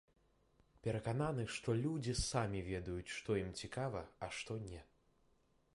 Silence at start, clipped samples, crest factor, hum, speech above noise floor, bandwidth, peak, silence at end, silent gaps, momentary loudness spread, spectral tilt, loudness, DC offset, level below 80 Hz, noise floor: 0.85 s; under 0.1%; 20 dB; none; 34 dB; 11.5 kHz; -22 dBFS; 0.9 s; none; 8 LU; -5 dB/octave; -42 LUFS; under 0.1%; -58 dBFS; -75 dBFS